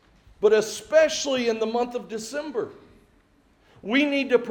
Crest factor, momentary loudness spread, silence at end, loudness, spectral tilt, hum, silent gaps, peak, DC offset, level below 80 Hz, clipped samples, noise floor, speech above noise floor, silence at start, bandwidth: 18 dB; 12 LU; 0 s; -24 LUFS; -3 dB/octave; none; none; -6 dBFS; under 0.1%; -62 dBFS; under 0.1%; -60 dBFS; 37 dB; 0.4 s; 17.5 kHz